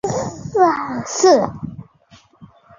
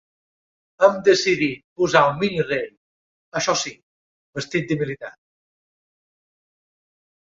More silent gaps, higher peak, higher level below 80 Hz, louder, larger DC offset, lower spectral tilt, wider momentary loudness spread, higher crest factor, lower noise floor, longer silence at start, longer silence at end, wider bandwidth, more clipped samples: second, none vs 1.64-1.76 s, 2.77-3.32 s, 3.83-4.33 s; about the same, -2 dBFS vs -2 dBFS; first, -52 dBFS vs -60 dBFS; first, -17 LUFS vs -21 LUFS; neither; about the same, -4.5 dB/octave vs -4 dB/octave; about the same, 15 LU vs 16 LU; about the same, 18 dB vs 22 dB; second, -51 dBFS vs under -90 dBFS; second, 0.05 s vs 0.8 s; second, 0.35 s vs 2.25 s; about the same, 7.6 kHz vs 7.8 kHz; neither